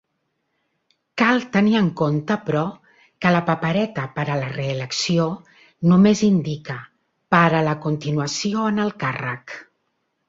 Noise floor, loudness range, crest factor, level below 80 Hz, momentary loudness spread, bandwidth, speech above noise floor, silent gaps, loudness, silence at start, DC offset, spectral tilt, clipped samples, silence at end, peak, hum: -73 dBFS; 3 LU; 20 dB; -58 dBFS; 13 LU; 7.8 kHz; 54 dB; none; -20 LUFS; 1.15 s; under 0.1%; -6 dB/octave; under 0.1%; 0.65 s; -2 dBFS; none